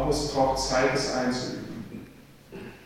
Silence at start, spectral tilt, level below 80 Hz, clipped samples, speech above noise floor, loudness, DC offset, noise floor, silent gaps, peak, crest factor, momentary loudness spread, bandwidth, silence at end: 0 s; -4 dB/octave; -44 dBFS; under 0.1%; 24 dB; -26 LUFS; under 0.1%; -49 dBFS; none; -10 dBFS; 18 dB; 19 LU; 16.5 kHz; 0 s